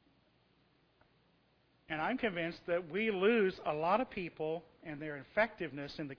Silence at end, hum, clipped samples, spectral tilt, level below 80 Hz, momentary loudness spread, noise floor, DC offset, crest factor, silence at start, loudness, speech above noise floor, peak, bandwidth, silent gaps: 0.05 s; none; under 0.1%; -3.5 dB/octave; -68 dBFS; 13 LU; -72 dBFS; under 0.1%; 20 dB; 1.9 s; -36 LUFS; 36 dB; -18 dBFS; 5.4 kHz; none